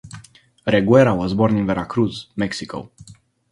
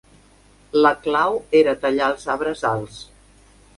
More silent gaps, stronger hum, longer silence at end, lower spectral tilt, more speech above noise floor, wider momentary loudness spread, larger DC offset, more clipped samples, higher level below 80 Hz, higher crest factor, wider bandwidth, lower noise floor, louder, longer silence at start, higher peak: neither; neither; second, 0.4 s vs 0.75 s; first, -7 dB/octave vs -5.5 dB/octave; second, 28 dB vs 33 dB; first, 16 LU vs 9 LU; neither; neither; first, -46 dBFS vs -52 dBFS; about the same, 20 dB vs 18 dB; about the same, 11.5 kHz vs 11.5 kHz; second, -47 dBFS vs -52 dBFS; about the same, -19 LUFS vs -20 LUFS; second, 0.05 s vs 0.75 s; about the same, 0 dBFS vs -2 dBFS